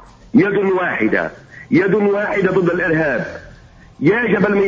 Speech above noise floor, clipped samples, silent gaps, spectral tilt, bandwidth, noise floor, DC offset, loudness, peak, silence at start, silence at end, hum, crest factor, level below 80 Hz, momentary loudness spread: 27 dB; under 0.1%; none; -8 dB/octave; 7.4 kHz; -42 dBFS; under 0.1%; -16 LUFS; -2 dBFS; 0.35 s; 0 s; none; 14 dB; -48 dBFS; 6 LU